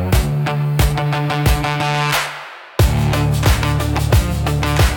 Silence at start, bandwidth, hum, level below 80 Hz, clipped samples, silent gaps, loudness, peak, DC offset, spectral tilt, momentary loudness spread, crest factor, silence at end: 0 s; 18 kHz; none; -22 dBFS; under 0.1%; none; -17 LUFS; -2 dBFS; under 0.1%; -5.5 dB/octave; 3 LU; 12 dB; 0 s